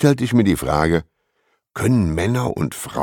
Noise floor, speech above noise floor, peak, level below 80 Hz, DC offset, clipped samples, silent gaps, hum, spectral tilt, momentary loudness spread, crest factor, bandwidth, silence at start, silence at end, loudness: -67 dBFS; 50 dB; -2 dBFS; -38 dBFS; under 0.1%; under 0.1%; none; none; -6.5 dB/octave; 8 LU; 18 dB; 18.5 kHz; 0 s; 0 s; -19 LUFS